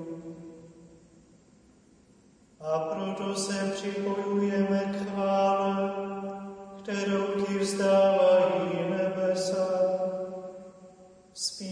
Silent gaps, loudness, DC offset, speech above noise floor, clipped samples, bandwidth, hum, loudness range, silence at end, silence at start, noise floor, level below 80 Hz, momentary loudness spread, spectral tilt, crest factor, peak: none; -28 LUFS; under 0.1%; 33 dB; under 0.1%; 10.5 kHz; none; 9 LU; 0 s; 0 s; -59 dBFS; -70 dBFS; 19 LU; -5 dB/octave; 16 dB; -12 dBFS